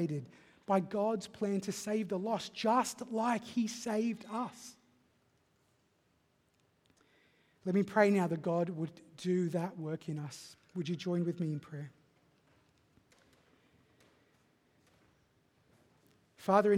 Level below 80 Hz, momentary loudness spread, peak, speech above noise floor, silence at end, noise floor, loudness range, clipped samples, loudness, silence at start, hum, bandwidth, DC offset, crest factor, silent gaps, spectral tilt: -80 dBFS; 15 LU; -12 dBFS; 40 dB; 0 s; -74 dBFS; 10 LU; under 0.1%; -35 LUFS; 0 s; none; 15.5 kHz; under 0.1%; 24 dB; none; -6 dB/octave